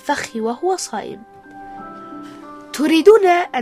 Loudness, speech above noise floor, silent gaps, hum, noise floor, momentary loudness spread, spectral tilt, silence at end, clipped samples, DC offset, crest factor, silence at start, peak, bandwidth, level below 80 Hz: -16 LUFS; 21 dB; none; none; -36 dBFS; 25 LU; -3.5 dB/octave; 0 s; 0.1%; under 0.1%; 18 dB; 0.05 s; 0 dBFS; 14 kHz; -58 dBFS